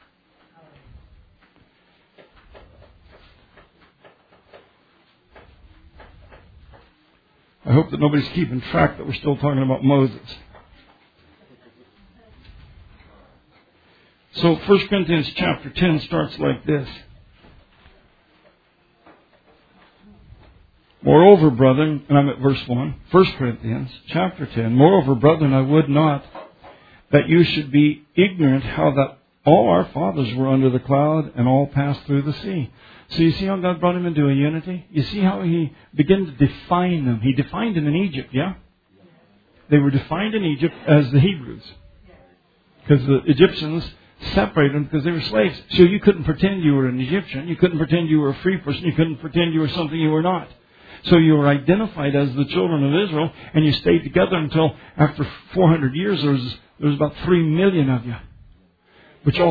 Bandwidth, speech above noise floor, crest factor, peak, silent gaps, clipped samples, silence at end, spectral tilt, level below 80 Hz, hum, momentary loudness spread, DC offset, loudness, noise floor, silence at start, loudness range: 5 kHz; 42 dB; 20 dB; 0 dBFS; none; under 0.1%; 0 s; -10 dB/octave; -46 dBFS; none; 10 LU; under 0.1%; -19 LUFS; -59 dBFS; 6 s; 6 LU